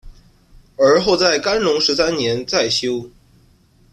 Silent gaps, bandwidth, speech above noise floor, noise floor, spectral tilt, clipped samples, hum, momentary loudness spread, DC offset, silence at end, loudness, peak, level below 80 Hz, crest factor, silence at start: none; 13 kHz; 36 dB; -53 dBFS; -3.5 dB/octave; under 0.1%; none; 6 LU; under 0.1%; 0.85 s; -16 LUFS; -2 dBFS; -46 dBFS; 16 dB; 0.05 s